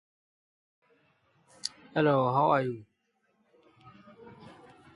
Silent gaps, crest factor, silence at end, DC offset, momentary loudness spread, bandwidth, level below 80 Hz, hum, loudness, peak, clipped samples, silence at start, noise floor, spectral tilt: none; 20 dB; 0.45 s; under 0.1%; 26 LU; 11.5 kHz; -74 dBFS; none; -28 LUFS; -12 dBFS; under 0.1%; 1.65 s; -75 dBFS; -6 dB/octave